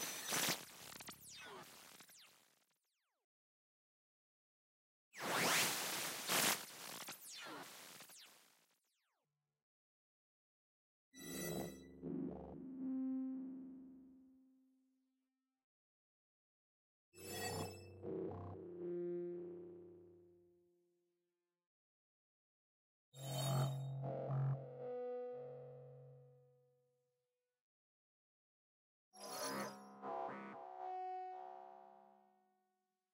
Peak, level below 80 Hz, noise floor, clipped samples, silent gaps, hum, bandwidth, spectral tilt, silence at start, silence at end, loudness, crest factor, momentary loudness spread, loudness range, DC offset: -24 dBFS; -80 dBFS; under -90 dBFS; under 0.1%; 3.24-5.11 s, 9.62-11.12 s, 15.64-17.12 s, 21.67-23.12 s, 27.61-29.11 s; none; 16 kHz; -3.5 dB/octave; 0 s; 1 s; -44 LUFS; 24 dB; 21 LU; 20 LU; under 0.1%